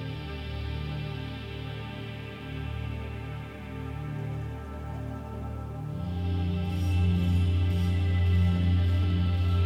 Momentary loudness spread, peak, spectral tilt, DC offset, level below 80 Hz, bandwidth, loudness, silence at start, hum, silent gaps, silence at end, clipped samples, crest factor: 12 LU; -16 dBFS; -8 dB/octave; under 0.1%; -40 dBFS; 6 kHz; -30 LUFS; 0 s; 50 Hz at -50 dBFS; none; 0 s; under 0.1%; 14 dB